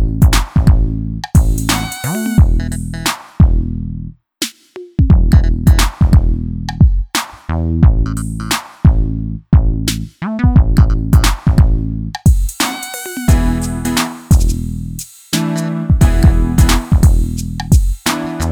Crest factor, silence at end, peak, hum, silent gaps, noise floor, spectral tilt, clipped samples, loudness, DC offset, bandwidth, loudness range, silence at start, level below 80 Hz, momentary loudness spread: 12 dB; 0 s; 0 dBFS; none; none; -35 dBFS; -5.5 dB/octave; under 0.1%; -14 LUFS; under 0.1%; 18.5 kHz; 3 LU; 0 s; -16 dBFS; 10 LU